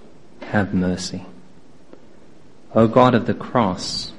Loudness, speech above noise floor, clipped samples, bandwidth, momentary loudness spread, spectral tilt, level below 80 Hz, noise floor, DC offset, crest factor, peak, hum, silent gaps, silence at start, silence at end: -19 LUFS; 31 dB; under 0.1%; 11 kHz; 14 LU; -6 dB/octave; -52 dBFS; -49 dBFS; 1%; 22 dB; 0 dBFS; none; none; 0.4 s; 0 s